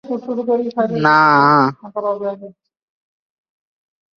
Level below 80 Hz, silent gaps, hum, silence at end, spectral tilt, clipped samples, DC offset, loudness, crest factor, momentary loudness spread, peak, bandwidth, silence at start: -64 dBFS; none; none; 1.65 s; -7 dB/octave; under 0.1%; under 0.1%; -15 LUFS; 18 dB; 13 LU; 0 dBFS; 7 kHz; 0.05 s